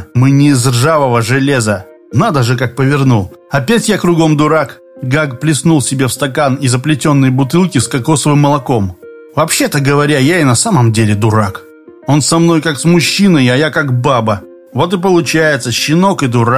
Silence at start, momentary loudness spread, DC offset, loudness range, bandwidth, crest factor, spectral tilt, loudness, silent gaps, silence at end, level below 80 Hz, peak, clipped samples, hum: 0 s; 7 LU; 0.2%; 1 LU; 15.5 kHz; 10 dB; -5.5 dB/octave; -11 LUFS; none; 0 s; -42 dBFS; 0 dBFS; under 0.1%; none